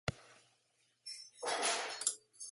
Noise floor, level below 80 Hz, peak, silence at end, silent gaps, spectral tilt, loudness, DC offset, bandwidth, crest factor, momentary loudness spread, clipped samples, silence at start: -77 dBFS; -66 dBFS; -18 dBFS; 0 s; none; -1 dB/octave; -38 LUFS; under 0.1%; 12 kHz; 24 dB; 14 LU; under 0.1%; 0.05 s